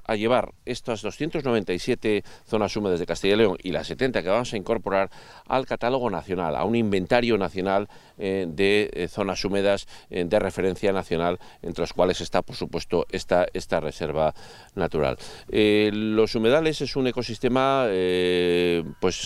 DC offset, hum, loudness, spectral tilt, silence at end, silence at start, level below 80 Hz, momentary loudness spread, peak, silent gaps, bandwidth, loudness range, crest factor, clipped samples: under 0.1%; none; -24 LUFS; -5.5 dB/octave; 0 s; 0 s; -46 dBFS; 8 LU; -4 dBFS; none; 13.5 kHz; 3 LU; 20 dB; under 0.1%